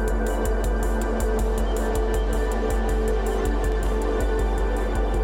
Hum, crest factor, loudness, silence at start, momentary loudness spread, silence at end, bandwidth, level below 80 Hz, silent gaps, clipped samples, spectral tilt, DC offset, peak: none; 10 dB; -25 LUFS; 0 s; 1 LU; 0 s; 16.5 kHz; -24 dBFS; none; under 0.1%; -6 dB/octave; under 0.1%; -12 dBFS